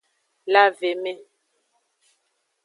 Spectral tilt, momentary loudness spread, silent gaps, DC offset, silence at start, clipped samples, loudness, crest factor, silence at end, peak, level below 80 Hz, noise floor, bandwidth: -3 dB/octave; 21 LU; none; under 0.1%; 0.45 s; under 0.1%; -20 LUFS; 22 dB; 1.5 s; -2 dBFS; -88 dBFS; -72 dBFS; 11.5 kHz